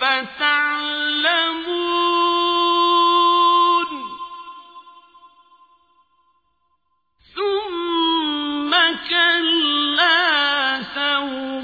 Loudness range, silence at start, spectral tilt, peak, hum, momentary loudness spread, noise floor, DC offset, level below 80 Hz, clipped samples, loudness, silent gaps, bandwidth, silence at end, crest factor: 12 LU; 0 s; -3 dB/octave; -4 dBFS; none; 11 LU; -69 dBFS; under 0.1%; -62 dBFS; under 0.1%; -17 LUFS; none; 5 kHz; 0 s; 16 dB